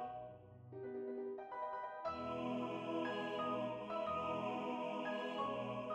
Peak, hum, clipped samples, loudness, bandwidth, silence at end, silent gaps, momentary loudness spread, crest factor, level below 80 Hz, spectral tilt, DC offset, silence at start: -30 dBFS; none; under 0.1%; -43 LUFS; 9.8 kHz; 0 s; none; 8 LU; 14 dB; -74 dBFS; -6.5 dB/octave; under 0.1%; 0 s